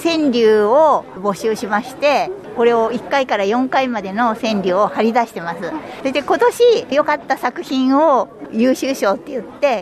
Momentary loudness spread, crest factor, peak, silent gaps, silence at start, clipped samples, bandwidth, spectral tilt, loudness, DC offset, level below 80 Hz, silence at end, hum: 10 LU; 14 dB; -2 dBFS; none; 0 s; under 0.1%; 13.5 kHz; -4.5 dB/octave; -16 LUFS; under 0.1%; -56 dBFS; 0 s; none